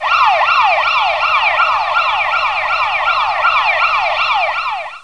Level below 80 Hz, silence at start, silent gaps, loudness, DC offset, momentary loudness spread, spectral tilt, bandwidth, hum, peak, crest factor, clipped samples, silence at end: -50 dBFS; 0 s; none; -13 LUFS; 0.6%; 4 LU; -0.5 dB/octave; 10.5 kHz; none; 0 dBFS; 14 dB; under 0.1%; 0 s